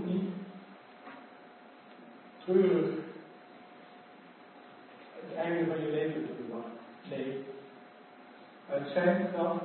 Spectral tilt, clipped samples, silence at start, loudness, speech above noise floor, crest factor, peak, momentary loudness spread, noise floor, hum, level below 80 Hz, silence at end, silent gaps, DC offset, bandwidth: -6 dB/octave; under 0.1%; 0 s; -33 LUFS; 24 dB; 22 dB; -12 dBFS; 25 LU; -54 dBFS; none; -84 dBFS; 0 s; none; under 0.1%; 4.3 kHz